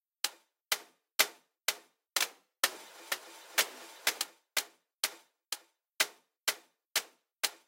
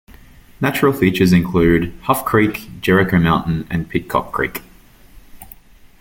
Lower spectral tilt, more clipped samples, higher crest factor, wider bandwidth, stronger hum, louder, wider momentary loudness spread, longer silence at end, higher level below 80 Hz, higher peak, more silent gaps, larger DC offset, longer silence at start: second, 3 dB/octave vs -6.5 dB/octave; neither; first, 30 dB vs 16 dB; about the same, 17 kHz vs 17 kHz; neither; second, -34 LUFS vs -17 LUFS; first, 11 LU vs 8 LU; about the same, 0.15 s vs 0.15 s; second, under -90 dBFS vs -38 dBFS; second, -8 dBFS vs 0 dBFS; neither; neither; first, 0.25 s vs 0.1 s